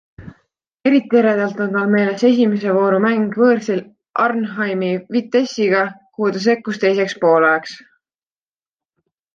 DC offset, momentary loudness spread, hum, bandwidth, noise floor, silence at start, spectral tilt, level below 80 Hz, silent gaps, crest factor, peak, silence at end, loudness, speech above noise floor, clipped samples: under 0.1%; 7 LU; none; 7.6 kHz; under -90 dBFS; 0.2 s; -6.5 dB/octave; -62 dBFS; 4.10-4.14 s; 14 dB; -2 dBFS; 1.6 s; -17 LUFS; over 74 dB; under 0.1%